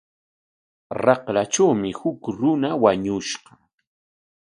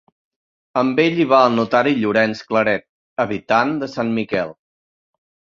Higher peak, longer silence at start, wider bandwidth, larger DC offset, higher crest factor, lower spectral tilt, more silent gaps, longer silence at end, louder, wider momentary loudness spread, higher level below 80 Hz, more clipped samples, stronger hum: about the same, 0 dBFS vs -2 dBFS; first, 0.9 s vs 0.75 s; first, 10.5 kHz vs 7.4 kHz; neither; about the same, 22 dB vs 18 dB; second, -5 dB/octave vs -6.5 dB/octave; second, none vs 2.89-3.16 s; about the same, 1.1 s vs 1.05 s; second, -21 LUFS vs -18 LUFS; about the same, 9 LU vs 10 LU; about the same, -58 dBFS vs -60 dBFS; neither; neither